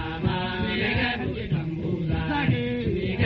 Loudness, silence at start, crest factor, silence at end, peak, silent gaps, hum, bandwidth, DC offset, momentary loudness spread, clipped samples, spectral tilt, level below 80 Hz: -26 LUFS; 0 s; 16 dB; 0 s; -10 dBFS; none; none; 5.8 kHz; under 0.1%; 4 LU; under 0.1%; -5 dB/octave; -40 dBFS